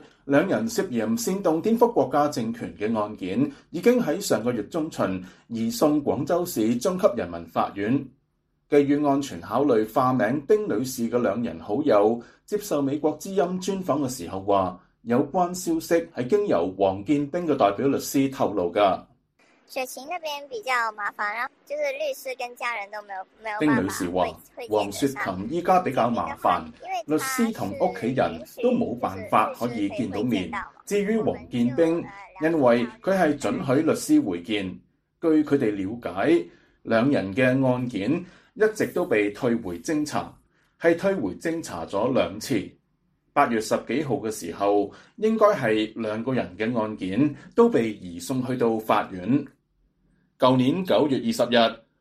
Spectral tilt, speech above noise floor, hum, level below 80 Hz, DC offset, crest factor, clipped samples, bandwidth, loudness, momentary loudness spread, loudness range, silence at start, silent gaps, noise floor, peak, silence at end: -5.5 dB/octave; 47 dB; none; -60 dBFS; under 0.1%; 20 dB; under 0.1%; 15 kHz; -24 LUFS; 10 LU; 3 LU; 0.25 s; none; -71 dBFS; -4 dBFS; 0.25 s